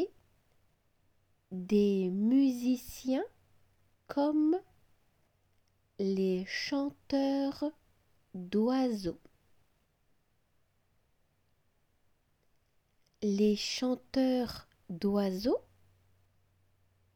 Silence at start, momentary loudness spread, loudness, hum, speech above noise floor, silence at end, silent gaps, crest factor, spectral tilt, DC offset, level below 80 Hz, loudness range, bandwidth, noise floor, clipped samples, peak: 0 s; 12 LU; -32 LUFS; none; 43 dB; 1.55 s; none; 16 dB; -6 dB/octave; under 0.1%; -66 dBFS; 5 LU; 17.5 kHz; -74 dBFS; under 0.1%; -18 dBFS